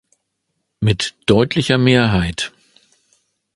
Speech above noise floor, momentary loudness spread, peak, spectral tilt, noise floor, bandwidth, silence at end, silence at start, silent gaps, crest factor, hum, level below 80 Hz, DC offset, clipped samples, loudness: 57 dB; 9 LU; 0 dBFS; -5.5 dB/octave; -73 dBFS; 11.5 kHz; 1.05 s; 0.8 s; none; 18 dB; none; -38 dBFS; under 0.1%; under 0.1%; -16 LUFS